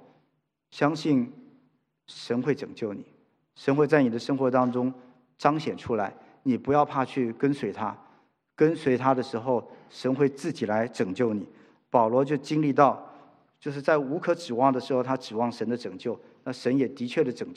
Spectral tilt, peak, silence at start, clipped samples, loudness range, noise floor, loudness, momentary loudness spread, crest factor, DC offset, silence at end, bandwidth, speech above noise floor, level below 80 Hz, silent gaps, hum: -7 dB/octave; -4 dBFS; 0.75 s; under 0.1%; 3 LU; -74 dBFS; -27 LUFS; 12 LU; 22 dB; under 0.1%; 0 s; 10.5 kHz; 48 dB; -74 dBFS; none; none